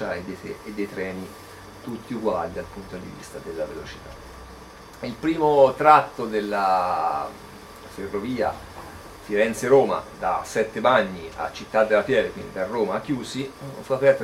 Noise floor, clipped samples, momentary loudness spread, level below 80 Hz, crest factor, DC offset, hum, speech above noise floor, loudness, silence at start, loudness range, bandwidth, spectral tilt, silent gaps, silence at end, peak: -43 dBFS; under 0.1%; 22 LU; -52 dBFS; 24 dB; under 0.1%; none; 20 dB; -23 LUFS; 0 s; 11 LU; 15.5 kHz; -5.5 dB/octave; none; 0 s; 0 dBFS